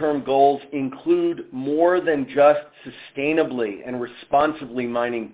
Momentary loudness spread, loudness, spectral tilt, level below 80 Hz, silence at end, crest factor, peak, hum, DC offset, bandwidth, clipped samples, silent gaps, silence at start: 13 LU; -21 LUFS; -10 dB/octave; -62 dBFS; 0 s; 18 dB; -4 dBFS; none; under 0.1%; 4 kHz; under 0.1%; none; 0 s